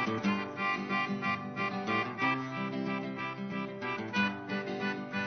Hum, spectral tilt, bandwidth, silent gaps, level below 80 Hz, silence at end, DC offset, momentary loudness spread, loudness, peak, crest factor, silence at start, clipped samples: none; -3.5 dB/octave; 6.4 kHz; none; -76 dBFS; 0 s; under 0.1%; 6 LU; -33 LUFS; -18 dBFS; 16 dB; 0 s; under 0.1%